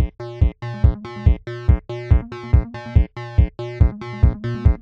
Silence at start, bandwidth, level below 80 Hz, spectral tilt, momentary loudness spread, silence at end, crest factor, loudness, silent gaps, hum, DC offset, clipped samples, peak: 0 s; 5.4 kHz; -20 dBFS; -9.5 dB/octave; 2 LU; 0.05 s; 16 dB; -21 LUFS; none; none; under 0.1%; under 0.1%; -2 dBFS